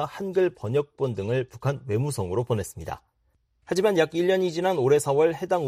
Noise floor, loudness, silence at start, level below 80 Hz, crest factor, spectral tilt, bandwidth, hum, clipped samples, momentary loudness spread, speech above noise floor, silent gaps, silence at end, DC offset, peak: -69 dBFS; -25 LUFS; 0 s; -58 dBFS; 18 dB; -6 dB/octave; 15.5 kHz; none; under 0.1%; 8 LU; 45 dB; none; 0 s; under 0.1%; -8 dBFS